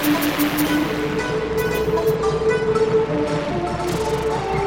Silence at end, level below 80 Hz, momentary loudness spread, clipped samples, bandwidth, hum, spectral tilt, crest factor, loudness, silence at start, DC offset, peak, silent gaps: 0 s; -38 dBFS; 4 LU; under 0.1%; 17 kHz; none; -5.5 dB/octave; 12 dB; -20 LUFS; 0 s; 0.2%; -8 dBFS; none